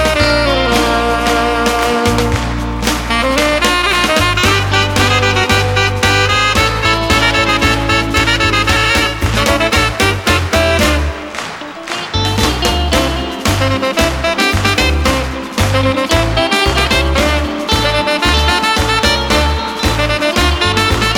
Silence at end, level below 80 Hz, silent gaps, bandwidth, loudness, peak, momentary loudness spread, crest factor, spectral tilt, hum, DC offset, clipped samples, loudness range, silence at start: 0 s; -22 dBFS; none; 19 kHz; -12 LUFS; 0 dBFS; 5 LU; 12 dB; -4 dB/octave; none; under 0.1%; under 0.1%; 3 LU; 0 s